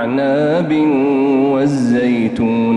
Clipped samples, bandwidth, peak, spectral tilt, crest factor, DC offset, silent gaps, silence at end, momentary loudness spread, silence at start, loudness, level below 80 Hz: under 0.1%; 10 kHz; -4 dBFS; -7.5 dB/octave; 8 dB; under 0.1%; none; 0 s; 2 LU; 0 s; -14 LUFS; -50 dBFS